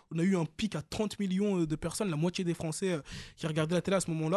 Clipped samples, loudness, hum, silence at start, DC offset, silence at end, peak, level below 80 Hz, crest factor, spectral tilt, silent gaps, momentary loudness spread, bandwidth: under 0.1%; -32 LUFS; none; 0.1 s; under 0.1%; 0 s; -16 dBFS; -58 dBFS; 16 dB; -5.5 dB/octave; none; 6 LU; 12.5 kHz